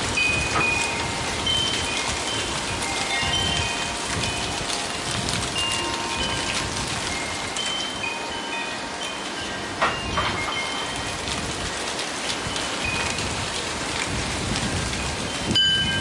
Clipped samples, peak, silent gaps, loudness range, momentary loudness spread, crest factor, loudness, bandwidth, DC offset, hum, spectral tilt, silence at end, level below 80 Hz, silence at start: under 0.1%; -8 dBFS; none; 3 LU; 7 LU; 18 dB; -24 LUFS; 11.5 kHz; under 0.1%; none; -2.5 dB/octave; 0 s; -42 dBFS; 0 s